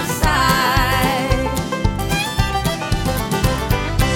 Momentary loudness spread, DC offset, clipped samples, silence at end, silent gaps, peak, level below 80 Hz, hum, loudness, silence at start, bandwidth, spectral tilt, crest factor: 6 LU; under 0.1%; under 0.1%; 0 s; none; 0 dBFS; -24 dBFS; none; -18 LUFS; 0 s; 19 kHz; -4.5 dB/octave; 16 dB